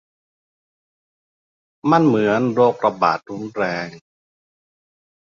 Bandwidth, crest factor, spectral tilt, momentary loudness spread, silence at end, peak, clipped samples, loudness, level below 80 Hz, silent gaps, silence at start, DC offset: 7.2 kHz; 20 dB; -7.5 dB/octave; 12 LU; 1.35 s; -2 dBFS; under 0.1%; -18 LUFS; -64 dBFS; none; 1.85 s; under 0.1%